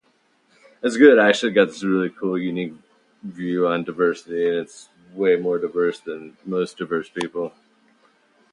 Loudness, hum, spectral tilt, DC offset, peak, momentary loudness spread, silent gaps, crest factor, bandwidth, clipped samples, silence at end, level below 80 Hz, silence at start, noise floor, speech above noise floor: -21 LUFS; none; -5.5 dB/octave; under 0.1%; 0 dBFS; 18 LU; none; 22 dB; 10.5 kHz; under 0.1%; 1.05 s; -70 dBFS; 0.85 s; -63 dBFS; 43 dB